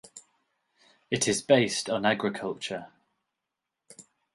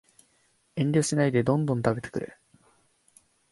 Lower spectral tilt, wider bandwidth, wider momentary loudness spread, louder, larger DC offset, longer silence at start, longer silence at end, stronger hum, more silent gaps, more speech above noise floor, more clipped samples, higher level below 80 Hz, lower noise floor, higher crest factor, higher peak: second, -3.5 dB/octave vs -6 dB/octave; about the same, 11.5 kHz vs 11.5 kHz; about the same, 13 LU vs 13 LU; about the same, -27 LUFS vs -26 LUFS; neither; second, 0.15 s vs 0.75 s; second, 0.35 s vs 1.25 s; neither; neither; first, 59 dB vs 42 dB; neither; second, -68 dBFS vs -60 dBFS; first, -86 dBFS vs -68 dBFS; about the same, 22 dB vs 20 dB; about the same, -8 dBFS vs -8 dBFS